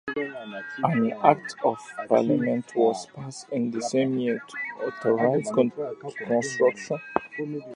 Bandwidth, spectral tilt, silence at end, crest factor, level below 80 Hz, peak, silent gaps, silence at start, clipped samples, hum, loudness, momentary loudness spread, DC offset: 11 kHz; -6 dB/octave; 0 s; 24 dB; -70 dBFS; -2 dBFS; none; 0.05 s; under 0.1%; none; -26 LUFS; 12 LU; under 0.1%